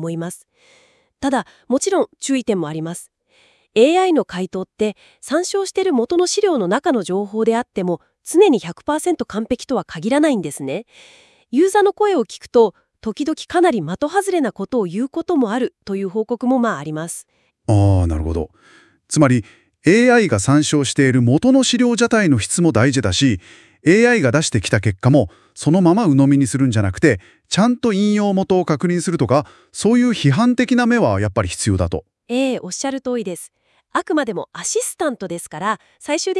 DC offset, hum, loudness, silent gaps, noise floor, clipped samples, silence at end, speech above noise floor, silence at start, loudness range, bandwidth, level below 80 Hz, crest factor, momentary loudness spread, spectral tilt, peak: under 0.1%; none; -17 LUFS; none; -56 dBFS; under 0.1%; 0 s; 40 dB; 0 s; 6 LU; 12 kHz; -46 dBFS; 18 dB; 11 LU; -5.5 dB/octave; 0 dBFS